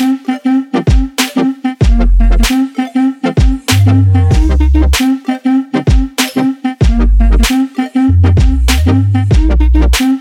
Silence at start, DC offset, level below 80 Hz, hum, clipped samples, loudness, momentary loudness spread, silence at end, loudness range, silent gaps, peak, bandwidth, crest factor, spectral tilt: 0 s; under 0.1%; -12 dBFS; none; under 0.1%; -11 LUFS; 5 LU; 0 s; 2 LU; none; 0 dBFS; 17 kHz; 10 dB; -6 dB/octave